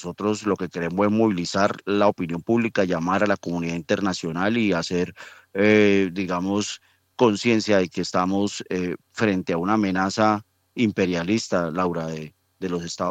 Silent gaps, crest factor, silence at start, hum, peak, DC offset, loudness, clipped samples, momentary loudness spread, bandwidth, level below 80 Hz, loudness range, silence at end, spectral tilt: none; 18 dB; 0 s; none; -4 dBFS; under 0.1%; -23 LUFS; under 0.1%; 10 LU; 9.2 kHz; -64 dBFS; 2 LU; 0 s; -5.5 dB/octave